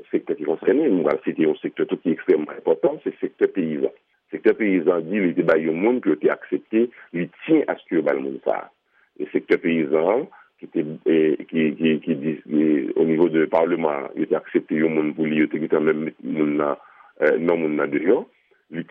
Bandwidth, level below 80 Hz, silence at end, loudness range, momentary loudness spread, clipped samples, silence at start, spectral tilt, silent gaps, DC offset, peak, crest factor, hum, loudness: 4.4 kHz; -70 dBFS; 0.05 s; 2 LU; 8 LU; under 0.1%; 0.15 s; -9.5 dB/octave; none; under 0.1%; -4 dBFS; 16 dB; none; -22 LUFS